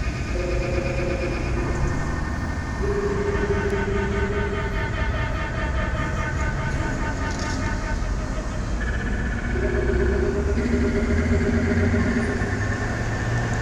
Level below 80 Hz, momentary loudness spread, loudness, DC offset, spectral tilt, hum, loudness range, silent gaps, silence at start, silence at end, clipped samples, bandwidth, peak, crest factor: -28 dBFS; 6 LU; -25 LUFS; under 0.1%; -6.5 dB/octave; none; 4 LU; none; 0 s; 0 s; under 0.1%; 10.5 kHz; -8 dBFS; 14 dB